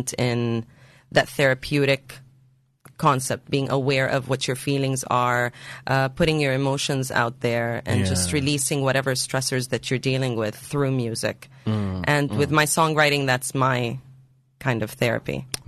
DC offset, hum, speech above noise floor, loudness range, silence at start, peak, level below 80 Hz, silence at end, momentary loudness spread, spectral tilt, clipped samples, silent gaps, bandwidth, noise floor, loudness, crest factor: under 0.1%; none; 36 dB; 2 LU; 0 s; -6 dBFS; -52 dBFS; 0.1 s; 8 LU; -4.5 dB/octave; under 0.1%; none; 13 kHz; -59 dBFS; -23 LUFS; 18 dB